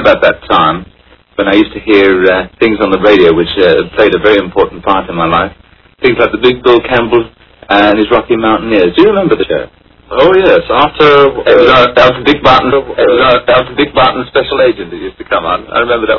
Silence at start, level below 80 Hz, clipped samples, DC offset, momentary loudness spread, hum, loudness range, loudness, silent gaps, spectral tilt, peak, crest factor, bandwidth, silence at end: 0 s; -34 dBFS; 1%; under 0.1%; 7 LU; none; 4 LU; -8 LUFS; none; -7 dB/octave; 0 dBFS; 8 dB; 6 kHz; 0 s